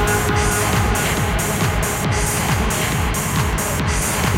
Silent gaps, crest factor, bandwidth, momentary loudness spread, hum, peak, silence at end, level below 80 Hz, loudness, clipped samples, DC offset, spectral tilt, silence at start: none; 14 dB; 17 kHz; 2 LU; none; -4 dBFS; 0 s; -26 dBFS; -18 LUFS; under 0.1%; under 0.1%; -4 dB/octave; 0 s